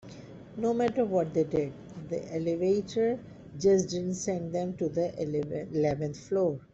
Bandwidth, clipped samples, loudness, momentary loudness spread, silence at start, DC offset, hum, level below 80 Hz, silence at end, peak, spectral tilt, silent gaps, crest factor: 8.2 kHz; under 0.1%; -30 LUFS; 11 LU; 0.05 s; under 0.1%; none; -62 dBFS; 0.1 s; -14 dBFS; -6.5 dB/octave; none; 16 dB